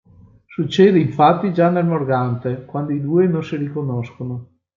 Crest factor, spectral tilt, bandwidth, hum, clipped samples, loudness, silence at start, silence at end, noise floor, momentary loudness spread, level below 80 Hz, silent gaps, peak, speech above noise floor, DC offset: 16 dB; -8.5 dB/octave; 7.4 kHz; none; under 0.1%; -18 LUFS; 0.5 s; 0.3 s; -47 dBFS; 14 LU; -60 dBFS; none; -2 dBFS; 30 dB; under 0.1%